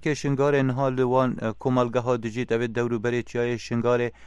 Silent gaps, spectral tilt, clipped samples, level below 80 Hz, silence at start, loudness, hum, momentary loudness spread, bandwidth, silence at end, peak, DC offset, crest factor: none; -7 dB/octave; under 0.1%; -54 dBFS; 0 s; -25 LUFS; none; 5 LU; 10.5 kHz; 0 s; -8 dBFS; under 0.1%; 16 dB